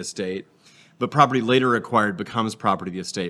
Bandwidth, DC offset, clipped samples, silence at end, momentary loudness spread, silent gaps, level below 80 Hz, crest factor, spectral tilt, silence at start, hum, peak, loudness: 12.5 kHz; under 0.1%; under 0.1%; 0 s; 12 LU; none; -68 dBFS; 22 dB; -5 dB/octave; 0 s; none; -2 dBFS; -22 LUFS